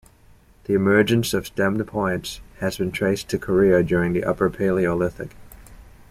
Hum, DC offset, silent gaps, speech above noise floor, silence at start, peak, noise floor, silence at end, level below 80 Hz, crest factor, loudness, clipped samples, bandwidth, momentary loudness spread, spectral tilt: none; under 0.1%; none; 31 dB; 0.7 s; -4 dBFS; -52 dBFS; 0.2 s; -46 dBFS; 18 dB; -21 LUFS; under 0.1%; 15.5 kHz; 11 LU; -6 dB/octave